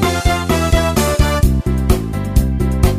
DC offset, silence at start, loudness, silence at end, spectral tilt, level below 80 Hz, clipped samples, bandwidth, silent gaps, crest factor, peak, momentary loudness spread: 0.2%; 0 s; -16 LUFS; 0 s; -5.5 dB/octave; -18 dBFS; under 0.1%; 15.5 kHz; none; 14 dB; 0 dBFS; 3 LU